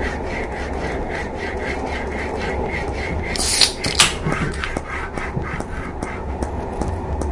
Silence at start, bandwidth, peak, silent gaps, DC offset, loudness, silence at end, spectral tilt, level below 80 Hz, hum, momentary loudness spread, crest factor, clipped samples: 0 s; 12 kHz; 0 dBFS; none; under 0.1%; -22 LUFS; 0 s; -3 dB/octave; -30 dBFS; none; 12 LU; 22 dB; under 0.1%